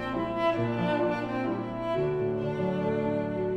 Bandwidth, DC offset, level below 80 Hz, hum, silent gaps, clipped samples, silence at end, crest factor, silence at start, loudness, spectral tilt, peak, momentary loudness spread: 9.2 kHz; under 0.1%; -54 dBFS; none; none; under 0.1%; 0 s; 12 dB; 0 s; -29 LUFS; -8 dB/octave; -16 dBFS; 4 LU